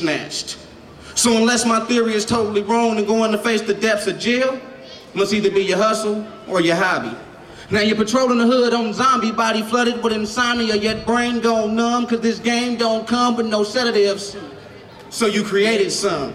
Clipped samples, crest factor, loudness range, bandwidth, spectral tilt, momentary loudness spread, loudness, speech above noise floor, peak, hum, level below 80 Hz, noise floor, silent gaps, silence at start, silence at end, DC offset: under 0.1%; 14 dB; 2 LU; 14 kHz; -3.5 dB/octave; 10 LU; -18 LUFS; 21 dB; -6 dBFS; none; -52 dBFS; -39 dBFS; none; 0 s; 0 s; under 0.1%